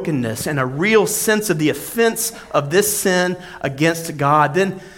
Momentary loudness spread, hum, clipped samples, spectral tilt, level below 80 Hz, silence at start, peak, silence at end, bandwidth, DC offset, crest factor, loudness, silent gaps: 7 LU; none; under 0.1%; -4 dB/octave; -52 dBFS; 0 s; -2 dBFS; 0.05 s; 17 kHz; under 0.1%; 16 dB; -18 LUFS; none